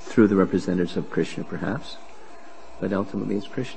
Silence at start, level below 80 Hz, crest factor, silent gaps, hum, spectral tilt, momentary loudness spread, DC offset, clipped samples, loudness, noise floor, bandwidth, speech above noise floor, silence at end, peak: 0 s; -58 dBFS; 20 dB; none; none; -7 dB/octave; 14 LU; 2%; under 0.1%; -25 LUFS; -46 dBFS; 8.8 kHz; 22 dB; 0 s; -4 dBFS